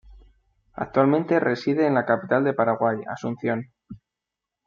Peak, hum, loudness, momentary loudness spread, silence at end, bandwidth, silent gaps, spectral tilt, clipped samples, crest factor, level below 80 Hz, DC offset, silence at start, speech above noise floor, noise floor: -4 dBFS; none; -23 LUFS; 11 LU; 0.7 s; 7.2 kHz; none; -8 dB/octave; under 0.1%; 20 dB; -58 dBFS; under 0.1%; 0.1 s; 64 dB; -86 dBFS